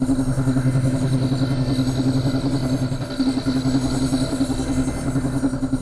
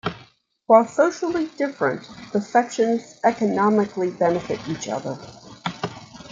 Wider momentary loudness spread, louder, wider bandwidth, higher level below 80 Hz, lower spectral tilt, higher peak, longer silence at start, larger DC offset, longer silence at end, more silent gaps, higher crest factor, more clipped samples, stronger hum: second, 3 LU vs 16 LU; about the same, -21 LUFS vs -22 LUFS; first, 11 kHz vs 7.8 kHz; first, -32 dBFS vs -62 dBFS; about the same, -6.5 dB/octave vs -5.5 dB/octave; second, -8 dBFS vs -2 dBFS; about the same, 0 s vs 0.05 s; neither; about the same, 0 s vs 0.05 s; neither; second, 12 dB vs 20 dB; neither; neither